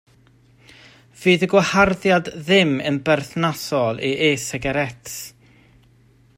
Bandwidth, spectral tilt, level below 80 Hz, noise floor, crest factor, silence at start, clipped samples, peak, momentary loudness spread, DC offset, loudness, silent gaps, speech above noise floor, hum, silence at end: 16 kHz; -4.5 dB/octave; -50 dBFS; -54 dBFS; 18 dB; 1.2 s; under 0.1%; -2 dBFS; 10 LU; under 0.1%; -19 LUFS; none; 35 dB; none; 1.1 s